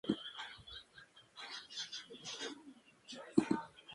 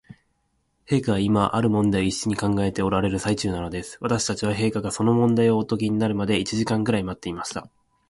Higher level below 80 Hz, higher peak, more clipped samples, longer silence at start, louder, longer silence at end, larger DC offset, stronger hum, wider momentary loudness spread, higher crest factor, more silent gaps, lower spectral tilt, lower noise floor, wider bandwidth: second, -74 dBFS vs -46 dBFS; second, -14 dBFS vs -6 dBFS; neither; second, 0.05 s vs 0.9 s; second, -42 LUFS vs -23 LUFS; second, 0 s vs 0.45 s; neither; neither; first, 22 LU vs 10 LU; first, 28 dB vs 18 dB; neither; second, -4 dB/octave vs -5.5 dB/octave; second, -62 dBFS vs -70 dBFS; about the same, 11.5 kHz vs 11.5 kHz